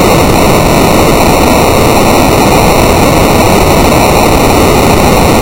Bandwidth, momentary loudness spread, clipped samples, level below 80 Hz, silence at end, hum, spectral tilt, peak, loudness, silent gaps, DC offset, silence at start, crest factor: over 20 kHz; 0 LU; 2%; -16 dBFS; 0 s; none; -5 dB/octave; 0 dBFS; -6 LUFS; none; under 0.1%; 0 s; 6 dB